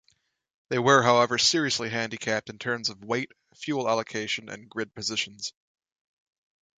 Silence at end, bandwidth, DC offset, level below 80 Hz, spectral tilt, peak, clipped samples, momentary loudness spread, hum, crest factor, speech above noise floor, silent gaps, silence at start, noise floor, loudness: 1.3 s; 9.6 kHz; under 0.1%; -68 dBFS; -3 dB/octave; -4 dBFS; under 0.1%; 15 LU; none; 24 dB; 43 dB; none; 0.7 s; -70 dBFS; -26 LUFS